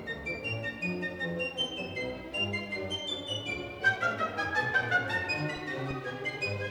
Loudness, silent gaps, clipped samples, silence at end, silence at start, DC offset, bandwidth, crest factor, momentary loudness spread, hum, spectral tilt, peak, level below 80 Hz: -32 LUFS; none; under 0.1%; 0 s; 0 s; under 0.1%; over 20 kHz; 18 dB; 8 LU; none; -4.5 dB/octave; -14 dBFS; -60 dBFS